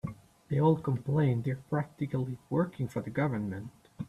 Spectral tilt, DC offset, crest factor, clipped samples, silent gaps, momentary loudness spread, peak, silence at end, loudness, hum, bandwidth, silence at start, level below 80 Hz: -9.5 dB/octave; under 0.1%; 18 dB; under 0.1%; none; 10 LU; -14 dBFS; 0 s; -31 LUFS; none; 12 kHz; 0.05 s; -62 dBFS